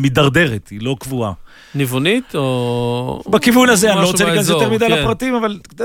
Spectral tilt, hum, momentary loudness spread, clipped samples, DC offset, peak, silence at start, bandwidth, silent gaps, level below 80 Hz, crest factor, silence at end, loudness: -4.5 dB/octave; none; 12 LU; under 0.1%; under 0.1%; -2 dBFS; 0 s; 17.5 kHz; none; -40 dBFS; 14 dB; 0 s; -15 LUFS